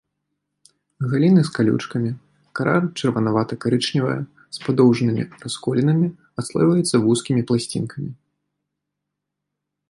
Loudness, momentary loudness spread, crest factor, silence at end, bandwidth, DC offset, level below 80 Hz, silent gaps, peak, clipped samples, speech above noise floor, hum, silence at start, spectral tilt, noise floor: -20 LUFS; 13 LU; 18 dB; 1.75 s; 11.5 kHz; under 0.1%; -60 dBFS; none; -4 dBFS; under 0.1%; 62 dB; none; 1 s; -6.5 dB/octave; -81 dBFS